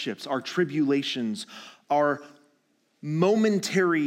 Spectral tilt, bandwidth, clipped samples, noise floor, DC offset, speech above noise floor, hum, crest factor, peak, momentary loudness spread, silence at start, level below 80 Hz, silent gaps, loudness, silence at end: -5.5 dB/octave; 16.5 kHz; under 0.1%; -69 dBFS; under 0.1%; 44 dB; none; 18 dB; -10 dBFS; 13 LU; 0 s; -88 dBFS; none; -26 LUFS; 0 s